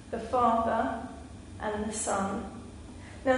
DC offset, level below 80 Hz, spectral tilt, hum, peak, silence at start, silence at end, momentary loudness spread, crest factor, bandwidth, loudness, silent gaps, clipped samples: under 0.1%; -50 dBFS; -4.5 dB/octave; none; -12 dBFS; 0 s; 0 s; 20 LU; 20 dB; 11 kHz; -30 LUFS; none; under 0.1%